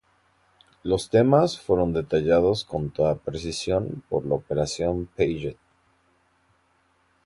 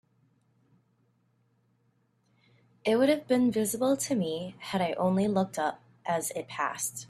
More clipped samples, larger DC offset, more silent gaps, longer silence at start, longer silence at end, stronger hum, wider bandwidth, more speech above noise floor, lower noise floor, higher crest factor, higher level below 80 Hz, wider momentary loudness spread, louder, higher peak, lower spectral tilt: neither; neither; neither; second, 0.85 s vs 2.85 s; first, 1.7 s vs 0.05 s; neither; second, 11.5 kHz vs 14.5 kHz; about the same, 42 dB vs 43 dB; second, -66 dBFS vs -71 dBFS; about the same, 20 dB vs 18 dB; first, -46 dBFS vs -70 dBFS; about the same, 10 LU vs 9 LU; first, -24 LUFS vs -29 LUFS; first, -6 dBFS vs -14 dBFS; first, -6 dB/octave vs -4.5 dB/octave